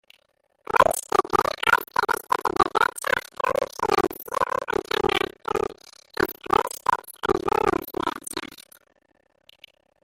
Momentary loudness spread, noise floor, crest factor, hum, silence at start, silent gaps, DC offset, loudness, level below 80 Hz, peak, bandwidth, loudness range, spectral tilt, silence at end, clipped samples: 8 LU; -67 dBFS; 24 dB; none; 0.75 s; none; under 0.1%; -24 LUFS; -50 dBFS; -2 dBFS; 16.5 kHz; 4 LU; -3 dB/octave; 1.45 s; under 0.1%